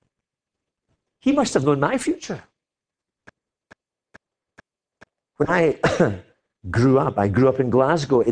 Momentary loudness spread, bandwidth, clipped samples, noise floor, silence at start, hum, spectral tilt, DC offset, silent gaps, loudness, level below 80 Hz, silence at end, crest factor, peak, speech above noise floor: 11 LU; 10.5 kHz; under 0.1%; -88 dBFS; 1.25 s; none; -6.5 dB/octave; under 0.1%; none; -20 LUFS; -50 dBFS; 0 s; 18 dB; -4 dBFS; 69 dB